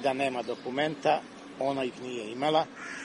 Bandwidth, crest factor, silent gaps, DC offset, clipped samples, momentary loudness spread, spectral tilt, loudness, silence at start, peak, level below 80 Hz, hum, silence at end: 11 kHz; 18 dB; none; under 0.1%; under 0.1%; 9 LU; -4.5 dB/octave; -30 LUFS; 0 s; -12 dBFS; -72 dBFS; none; 0 s